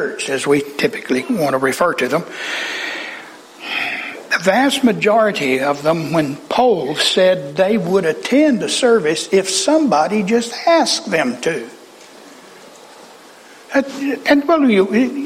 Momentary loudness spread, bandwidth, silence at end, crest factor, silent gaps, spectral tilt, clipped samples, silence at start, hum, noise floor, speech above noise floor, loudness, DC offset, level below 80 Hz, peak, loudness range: 8 LU; 16 kHz; 0 s; 14 dB; none; -4 dB/octave; under 0.1%; 0 s; none; -41 dBFS; 26 dB; -16 LUFS; under 0.1%; -58 dBFS; -2 dBFS; 5 LU